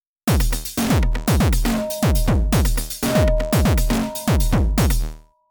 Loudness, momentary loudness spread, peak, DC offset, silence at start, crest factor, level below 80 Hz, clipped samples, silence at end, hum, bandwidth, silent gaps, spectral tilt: -20 LUFS; 4 LU; -8 dBFS; under 0.1%; 0.25 s; 10 dB; -22 dBFS; under 0.1%; 0.3 s; none; over 20 kHz; none; -5.5 dB/octave